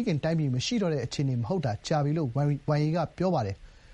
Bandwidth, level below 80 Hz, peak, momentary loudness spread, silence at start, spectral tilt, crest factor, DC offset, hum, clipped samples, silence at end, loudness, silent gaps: 9 kHz; -54 dBFS; -14 dBFS; 3 LU; 0 s; -6.5 dB/octave; 14 dB; under 0.1%; none; under 0.1%; 0 s; -28 LUFS; none